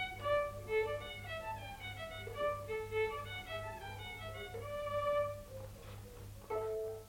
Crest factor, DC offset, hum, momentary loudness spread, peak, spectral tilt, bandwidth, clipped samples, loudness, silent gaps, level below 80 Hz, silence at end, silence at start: 16 dB; under 0.1%; 50 Hz at -55 dBFS; 14 LU; -24 dBFS; -4.5 dB/octave; 16.5 kHz; under 0.1%; -40 LUFS; none; -56 dBFS; 0 s; 0 s